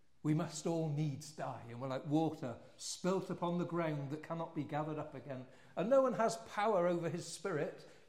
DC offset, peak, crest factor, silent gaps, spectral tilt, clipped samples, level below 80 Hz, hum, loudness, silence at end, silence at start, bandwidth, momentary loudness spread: under 0.1%; -20 dBFS; 18 dB; none; -6 dB/octave; under 0.1%; -78 dBFS; none; -38 LUFS; 0.15 s; 0.25 s; 15 kHz; 13 LU